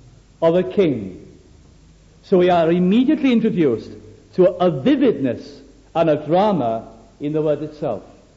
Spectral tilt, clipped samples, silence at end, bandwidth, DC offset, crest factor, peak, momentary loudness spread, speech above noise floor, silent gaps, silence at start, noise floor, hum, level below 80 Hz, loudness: -8.5 dB/octave; under 0.1%; 0.35 s; 7.6 kHz; under 0.1%; 14 dB; -4 dBFS; 12 LU; 31 dB; none; 0.4 s; -48 dBFS; none; -52 dBFS; -18 LUFS